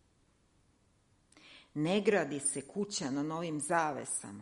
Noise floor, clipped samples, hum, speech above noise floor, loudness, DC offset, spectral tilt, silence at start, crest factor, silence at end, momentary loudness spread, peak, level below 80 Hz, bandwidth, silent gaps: -70 dBFS; under 0.1%; none; 37 dB; -34 LUFS; under 0.1%; -4 dB/octave; 1.45 s; 20 dB; 0 s; 8 LU; -16 dBFS; -74 dBFS; 11.5 kHz; none